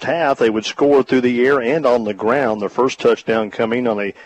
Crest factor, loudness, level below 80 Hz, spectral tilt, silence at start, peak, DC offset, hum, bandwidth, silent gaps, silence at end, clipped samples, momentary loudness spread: 12 dB; -16 LUFS; -58 dBFS; -5.5 dB/octave; 0 s; -4 dBFS; under 0.1%; none; 8.4 kHz; none; 0 s; under 0.1%; 4 LU